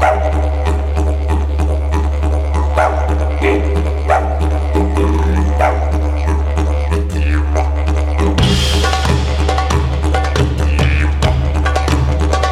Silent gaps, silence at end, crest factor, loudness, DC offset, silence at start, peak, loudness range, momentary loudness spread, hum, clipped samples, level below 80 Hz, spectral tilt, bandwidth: none; 0 s; 14 dB; -15 LUFS; under 0.1%; 0 s; 0 dBFS; 1 LU; 3 LU; none; under 0.1%; -16 dBFS; -6 dB/octave; 11 kHz